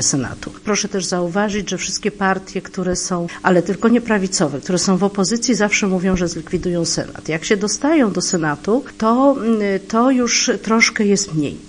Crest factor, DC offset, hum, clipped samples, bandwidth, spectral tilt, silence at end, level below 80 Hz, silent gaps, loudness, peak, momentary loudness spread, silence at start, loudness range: 18 dB; under 0.1%; none; under 0.1%; 10.5 kHz; -4 dB/octave; 0 s; -44 dBFS; none; -17 LUFS; 0 dBFS; 7 LU; 0 s; 3 LU